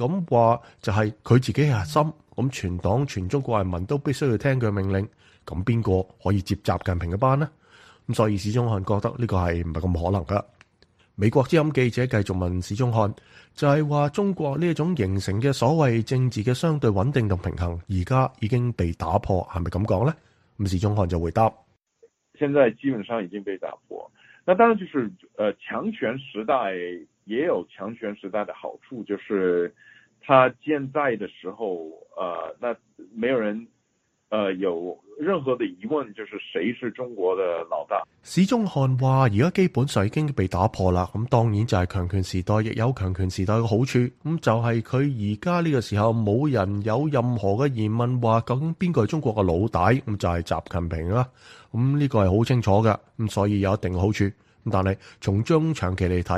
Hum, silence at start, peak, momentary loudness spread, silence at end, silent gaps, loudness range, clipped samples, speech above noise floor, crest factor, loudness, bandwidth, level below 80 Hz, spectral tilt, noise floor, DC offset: none; 0 s; -2 dBFS; 10 LU; 0 s; none; 5 LU; under 0.1%; 48 dB; 22 dB; -24 LUFS; 12.5 kHz; -46 dBFS; -7.5 dB/octave; -71 dBFS; under 0.1%